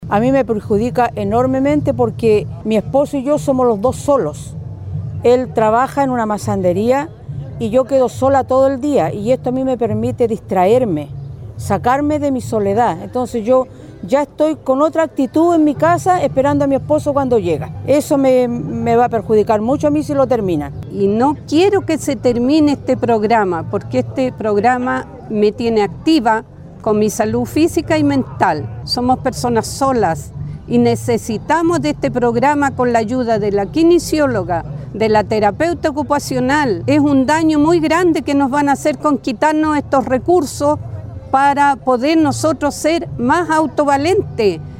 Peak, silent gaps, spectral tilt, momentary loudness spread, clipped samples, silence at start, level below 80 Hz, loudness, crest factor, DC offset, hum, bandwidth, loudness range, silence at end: 0 dBFS; none; -6 dB/octave; 7 LU; under 0.1%; 0 s; -40 dBFS; -15 LUFS; 14 dB; under 0.1%; none; 16.5 kHz; 2 LU; 0 s